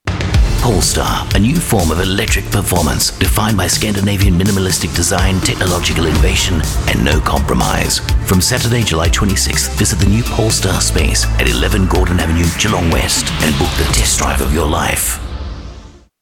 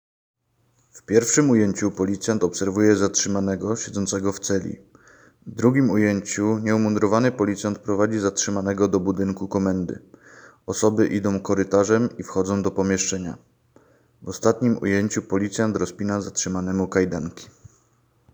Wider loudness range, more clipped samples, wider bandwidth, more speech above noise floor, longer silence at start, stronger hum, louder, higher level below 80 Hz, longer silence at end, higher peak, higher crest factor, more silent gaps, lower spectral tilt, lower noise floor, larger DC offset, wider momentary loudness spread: about the same, 1 LU vs 3 LU; neither; about the same, 18.5 kHz vs over 20 kHz; second, 23 dB vs 43 dB; second, 0.05 s vs 0.95 s; neither; first, -13 LUFS vs -22 LUFS; first, -20 dBFS vs -58 dBFS; second, 0.35 s vs 0.9 s; about the same, 0 dBFS vs -2 dBFS; second, 14 dB vs 20 dB; neither; about the same, -4 dB/octave vs -5 dB/octave; second, -36 dBFS vs -65 dBFS; first, 0.2% vs under 0.1%; second, 2 LU vs 8 LU